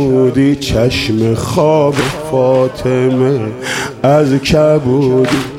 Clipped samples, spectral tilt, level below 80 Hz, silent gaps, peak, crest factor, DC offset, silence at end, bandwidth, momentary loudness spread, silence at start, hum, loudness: under 0.1%; -6 dB/octave; -36 dBFS; none; 0 dBFS; 10 dB; under 0.1%; 0 s; 16 kHz; 5 LU; 0 s; none; -12 LUFS